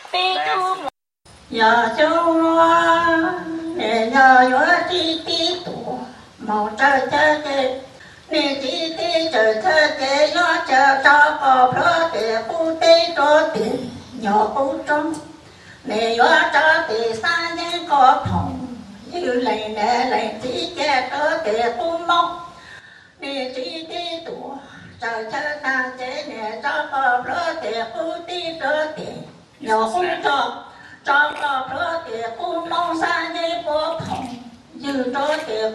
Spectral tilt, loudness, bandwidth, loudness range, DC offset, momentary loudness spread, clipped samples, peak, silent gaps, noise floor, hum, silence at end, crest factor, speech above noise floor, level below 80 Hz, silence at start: -3.5 dB/octave; -18 LUFS; 11.5 kHz; 8 LU; under 0.1%; 15 LU; under 0.1%; 0 dBFS; none; -50 dBFS; none; 0 s; 18 dB; 32 dB; -56 dBFS; 0 s